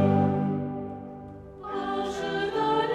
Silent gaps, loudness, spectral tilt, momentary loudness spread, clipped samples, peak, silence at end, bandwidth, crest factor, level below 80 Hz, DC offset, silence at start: none; -28 LUFS; -7 dB/octave; 17 LU; under 0.1%; -10 dBFS; 0 s; 10.5 kHz; 16 dB; -56 dBFS; under 0.1%; 0 s